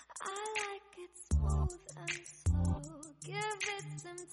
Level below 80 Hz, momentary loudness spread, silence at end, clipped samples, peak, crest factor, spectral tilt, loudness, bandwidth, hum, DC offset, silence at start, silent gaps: -42 dBFS; 15 LU; 0 s; under 0.1%; -22 dBFS; 16 dB; -4.5 dB/octave; -38 LUFS; 11.5 kHz; none; under 0.1%; 0 s; none